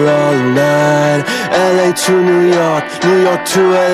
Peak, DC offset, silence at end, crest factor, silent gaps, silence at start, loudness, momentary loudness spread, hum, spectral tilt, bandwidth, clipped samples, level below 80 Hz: 0 dBFS; under 0.1%; 0 s; 10 dB; none; 0 s; -11 LUFS; 3 LU; none; -5 dB/octave; 14.5 kHz; under 0.1%; -56 dBFS